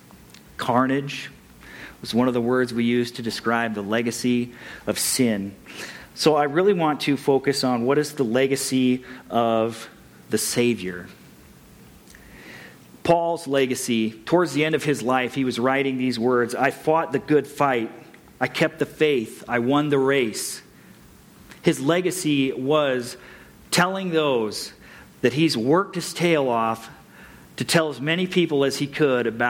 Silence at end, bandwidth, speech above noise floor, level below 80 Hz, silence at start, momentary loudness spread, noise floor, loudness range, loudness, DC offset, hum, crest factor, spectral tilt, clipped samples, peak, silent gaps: 0 s; 17.5 kHz; 27 dB; -60 dBFS; 0.6 s; 13 LU; -49 dBFS; 3 LU; -22 LUFS; under 0.1%; none; 18 dB; -4.5 dB/octave; under 0.1%; -6 dBFS; none